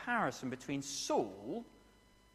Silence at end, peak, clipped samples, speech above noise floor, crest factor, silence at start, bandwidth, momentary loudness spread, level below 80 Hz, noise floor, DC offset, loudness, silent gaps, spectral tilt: 0.55 s; -20 dBFS; under 0.1%; 27 dB; 18 dB; 0 s; 15.5 kHz; 10 LU; -70 dBFS; -65 dBFS; under 0.1%; -39 LUFS; none; -3.5 dB/octave